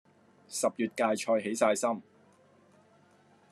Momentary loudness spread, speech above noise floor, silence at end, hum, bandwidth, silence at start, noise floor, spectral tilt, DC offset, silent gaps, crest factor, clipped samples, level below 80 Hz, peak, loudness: 8 LU; 33 dB; 1.5 s; none; 13 kHz; 0.5 s; -63 dBFS; -3.5 dB/octave; under 0.1%; none; 22 dB; under 0.1%; -88 dBFS; -12 dBFS; -30 LUFS